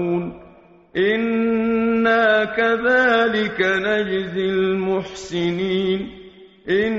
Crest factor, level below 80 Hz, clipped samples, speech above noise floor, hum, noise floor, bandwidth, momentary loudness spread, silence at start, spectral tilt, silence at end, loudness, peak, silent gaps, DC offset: 16 dB; -52 dBFS; under 0.1%; 24 dB; none; -43 dBFS; 7.6 kHz; 10 LU; 0 s; -3.5 dB/octave; 0 s; -19 LUFS; -4 dBFS; none; under 0.1%